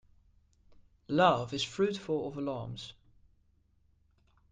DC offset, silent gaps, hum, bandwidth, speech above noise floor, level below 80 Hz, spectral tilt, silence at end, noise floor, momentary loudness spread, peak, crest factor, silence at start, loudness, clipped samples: under 0.1%; none; 50 Hz at -60 dBFS; 9.4 kHz; 38 dB; -66 dBFS; -5.5 dB/octave; 1.6 s; -69 dBFS; 16 LU; -12 dBFS; 24 dB; 1.1 s; -31 LUFS; under 0.1%